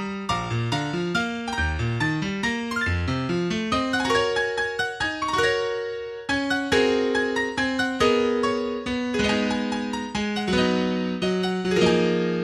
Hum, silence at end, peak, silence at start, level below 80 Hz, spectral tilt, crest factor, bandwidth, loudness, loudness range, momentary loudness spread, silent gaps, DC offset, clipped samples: none; 0 s; -8 dBFS; 0 s; -44 dBFS; -5 dB/octave; 16 dB; 13 kHz; -24 LUFS; 2 LU; 6 LU; none; under 0.1%; under 0.1%